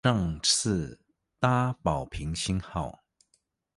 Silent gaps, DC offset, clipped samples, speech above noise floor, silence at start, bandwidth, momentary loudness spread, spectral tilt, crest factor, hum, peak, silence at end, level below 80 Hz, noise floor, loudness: none; under 0.1%; under 0.1%; 45 dB; 0.05 s; 11.5 kHz; 11 LU; -4 dB/octave; 20 dB; none; -10 dBFS; 0.85 s; -46 dBFS; -73 dBFS; -28 LUFS